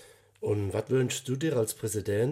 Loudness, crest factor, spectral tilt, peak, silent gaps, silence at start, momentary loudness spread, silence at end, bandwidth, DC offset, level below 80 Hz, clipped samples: -30 LUFS; 14 dB; -5.5 dB/octave; -16 dBFS; none; 0 s; 4 LU; 0 s; 16 kHz; under 0.1%; -66 dBFS; under 0.1%